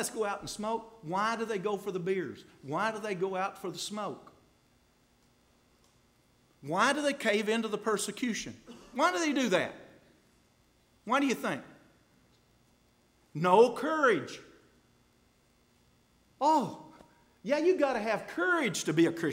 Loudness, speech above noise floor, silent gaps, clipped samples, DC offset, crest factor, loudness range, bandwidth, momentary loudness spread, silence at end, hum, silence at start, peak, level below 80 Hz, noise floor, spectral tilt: -30 LUFS; 37 dB; none; under 0.1%; under 0.1%; 22 dB; 7 LU; 16 kHz; 15 LU; 0 s; none; 0 s; -10 dBFS; -72 dBFS; -67 dBFS; -4 dB/octave